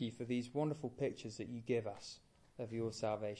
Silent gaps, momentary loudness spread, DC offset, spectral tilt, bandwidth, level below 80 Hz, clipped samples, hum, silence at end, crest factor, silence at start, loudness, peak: none; 12 LU; under 0.1%; -6 dB/octave; 11 kHz; -74 dBFS; under 0.1%; none; 0 s; 16 dB; 0 s; -42 LUFS; -24 dBFS